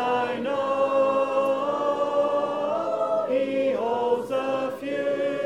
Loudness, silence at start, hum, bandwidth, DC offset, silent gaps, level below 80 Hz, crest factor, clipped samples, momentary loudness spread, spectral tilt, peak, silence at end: -25 LUFS; 0 s; none; 11.5 kHz; under 0.1%; none; -66 dBFS; 14 dB; under 0.1%; 4 LU; -5.5 dB/octave; -10 dBFS; 0 s